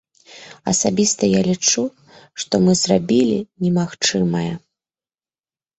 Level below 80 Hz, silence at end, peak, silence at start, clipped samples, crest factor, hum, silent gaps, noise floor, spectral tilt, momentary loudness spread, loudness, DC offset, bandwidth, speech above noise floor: -54 dBFS; 1.2 s; -4 dBFS; 0.3 s; under 0.1%; 16 dB; none; none; under -90 dBFS; -4.5 dB/octave; 11 LU; -18 LUFS; under 0.1%; 8.2 kHz; over 72 dB